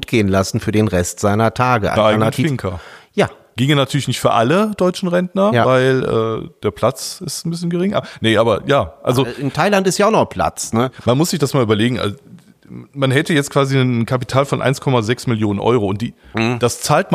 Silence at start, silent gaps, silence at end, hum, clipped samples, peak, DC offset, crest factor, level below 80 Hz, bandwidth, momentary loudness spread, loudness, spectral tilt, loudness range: 0 s; none; 0 s; none; under 0.1%; -2 dBFS; under 0.1%; 14 dB; -46 dBFS; 15.5 kHz; 8 LU; -16 LUFS; -5.5 dB/octave; 2 LU